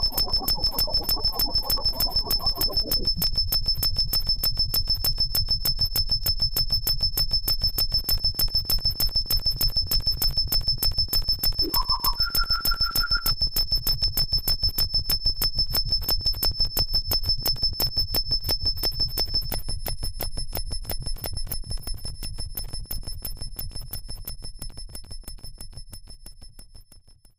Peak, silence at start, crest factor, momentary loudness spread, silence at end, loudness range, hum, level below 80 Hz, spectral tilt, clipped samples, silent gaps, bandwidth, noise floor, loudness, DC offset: -10 dBFS; 0 s; 14 dB; 13 LU; 0.4 s; 13 LU; none; -30 dBFS; -2 dB/octave; under 0.1%; none; 15.5 kHz; -51 dBFS; -23 LUFS; under 0.1%